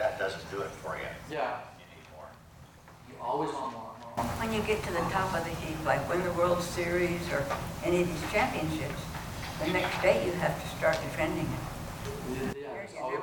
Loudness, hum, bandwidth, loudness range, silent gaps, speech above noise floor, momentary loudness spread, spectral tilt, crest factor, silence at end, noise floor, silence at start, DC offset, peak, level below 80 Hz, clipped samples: -32 LUFS; none; 18 kHz; 8 LU; none; 22 dB; 11 LU; -5 dB/octave; 22 dB; 0 s; -53 dBFS; 0 s; under 0.1%; -12 dBFS; -50 dBFS; under 0.1%